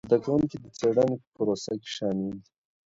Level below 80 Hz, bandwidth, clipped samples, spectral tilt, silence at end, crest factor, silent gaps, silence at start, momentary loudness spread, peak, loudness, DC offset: -60 dBFS; 7.8 kHz; under 0.1%; -6.5 dB/octave; 0.5 s; 20 dB; 1.27-1.32 s; 0.05 s; 9 LU; -8 dBFS; -28 LUFS; under 0.1%